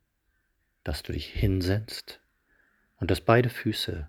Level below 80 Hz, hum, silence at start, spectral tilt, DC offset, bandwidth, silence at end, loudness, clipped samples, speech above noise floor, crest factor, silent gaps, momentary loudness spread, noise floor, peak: -42 dBFS; none; 0.85 s; -6 dB/octave; under 0.1%; 17 kHz; 0 s; -28 LUFS; under 0.1%; 47 dB; 24 dB; none; 16 LU; -74 dBFS; -4 dBFS